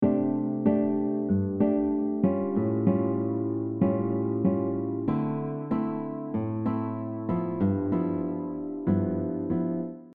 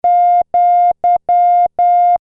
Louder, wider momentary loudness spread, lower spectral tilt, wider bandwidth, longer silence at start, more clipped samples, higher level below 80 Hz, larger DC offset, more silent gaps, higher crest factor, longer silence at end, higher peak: second, -28 LUFS vs -12 LUFS; first, 6 LU vs 2 LU; first, -11.5 dB/octave vs -6.5 dB/octave; about the same, 3.6 kHz vs 3.7 kHz; about the same, 0 s vs 0.05 s; neither; second, -62 dBFS vs -54 dBFS; neither; neither; first, 16 dB vs 4 dB; about the same, 0 s vs 0.05 s; second, -12 dBFS vs -6 dBFS